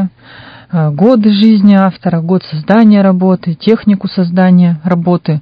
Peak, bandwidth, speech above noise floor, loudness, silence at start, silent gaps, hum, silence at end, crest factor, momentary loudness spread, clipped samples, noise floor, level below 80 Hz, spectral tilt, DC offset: 0 dBFS; 5.2 kHz; 26 dB; -10 LUFS; 0 s; none; none; 0 s; 10 dB; 8 LU; 0.9%; -35 dBFS; -52 dBFS; -10 dB/octave; under 0.1%